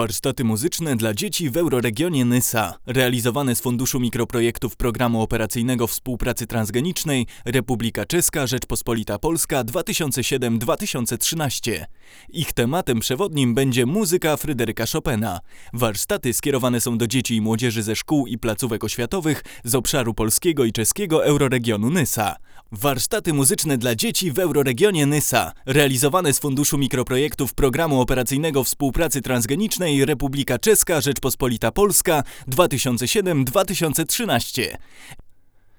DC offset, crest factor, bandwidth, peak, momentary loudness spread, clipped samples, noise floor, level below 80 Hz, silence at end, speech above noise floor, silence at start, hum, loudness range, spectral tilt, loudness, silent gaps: under 0.1%; 20 dB; over 20 kHz; 0 dBFS; 6 LU; under 0.1%; -48 dBFS; -40 dBFS; 0.5 s; 28 dB; 0 s; none; 3 LU; -4 dB/octave; -21 LUFS; none